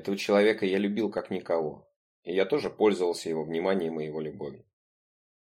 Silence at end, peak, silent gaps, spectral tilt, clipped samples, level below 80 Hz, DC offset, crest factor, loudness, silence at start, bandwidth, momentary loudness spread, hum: 0.85 s; -10 dBFS; 1.96-2.23 s; -5.5 dB/octave; under 0.1%; -70 dBFS; under 0.1%; 20 dB; -28 LUFS; 0 s; 14 kHz; 13 LU; none